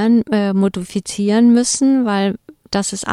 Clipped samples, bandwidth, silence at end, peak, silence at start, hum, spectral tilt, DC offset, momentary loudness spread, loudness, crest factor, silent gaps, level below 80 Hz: under 0.1%; 12.5 kHz; 0 s; -2 dBFS; 0 s; none; -5 dB/octave; under 0.1%; 11 LU; -16 LUFS; 14 dB; none; -52 dBFS